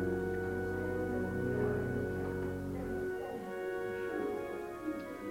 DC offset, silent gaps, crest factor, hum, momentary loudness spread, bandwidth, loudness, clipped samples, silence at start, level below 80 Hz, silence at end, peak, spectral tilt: under 0.1%; none; 14 dB; none; 6 LU; 16 kHz; -37 LUFS; under 0.1%; 0 s; -54 dBFS; 0 s; -22 dBFS; -7.5 dB/octave